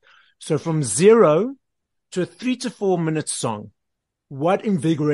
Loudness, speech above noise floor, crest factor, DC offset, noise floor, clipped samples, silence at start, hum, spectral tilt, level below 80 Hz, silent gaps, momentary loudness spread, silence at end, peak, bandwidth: -20 LUFS; 61 dB; 18 dB; under 0.1%; -80 dBFS; under 0.1%; 0.4 s; none; -5.5 dB/octave; -66 dBFS; none; 14 LU; 0 s; -2 dBFS; 11.5 kHz